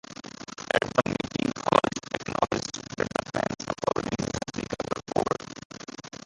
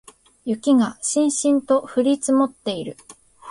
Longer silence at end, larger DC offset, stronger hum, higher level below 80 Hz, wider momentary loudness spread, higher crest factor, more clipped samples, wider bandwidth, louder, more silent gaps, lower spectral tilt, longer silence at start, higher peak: first, 0.15 s vs 0 s; neither; neither; first, -54 dBFS vs -62 dBFS; first, 17 LU vs 10 LU; first, 28 dB vs 14 dB; neither; about the same, 11.5 kHz vs 11.5 kHz; second, -29 LUFS vs -20 LUFS; first, 5.65-5.70 s vs none; about the same, -4.5 dB/octave vs -4 dB/octave; second, 0.1 s vs 0.45 s; first, -2 dBFS vs -6 dBFS